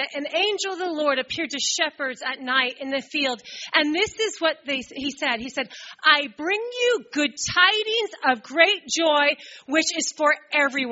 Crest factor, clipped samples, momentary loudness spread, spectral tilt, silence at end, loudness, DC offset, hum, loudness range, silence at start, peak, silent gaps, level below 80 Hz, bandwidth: 22 dB; under 0.1%; 9 LU; 1 dB/octave; 0 s; -22 LUFS; under 0.1%; none; 4 LU; 0 s; -2 dBFS; none; -64 dBFS; 8 kHz